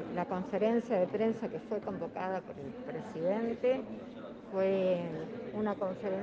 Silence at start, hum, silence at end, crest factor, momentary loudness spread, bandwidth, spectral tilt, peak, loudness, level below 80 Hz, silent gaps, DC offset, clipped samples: 0 s; none; 0 s; 16 dB; 12 LU; 7.6 kHz; -8 dB/octave; -18 dBFS; -35 LUFS; -70 dBFS; none; under 0.1%; under 0.1%